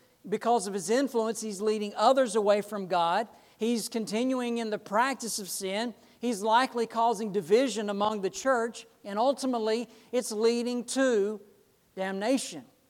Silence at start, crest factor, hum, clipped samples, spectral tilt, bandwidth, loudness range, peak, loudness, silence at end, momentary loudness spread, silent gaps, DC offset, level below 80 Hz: 0.25 s; 18 dB; none; under 0.1%; -3.5 dB/octave; 16.5 kHz; 2 LU; -10 dBFS; -29 LUFS; 0.25 s; 9 LU; none; under 0.1%; -78 dBFS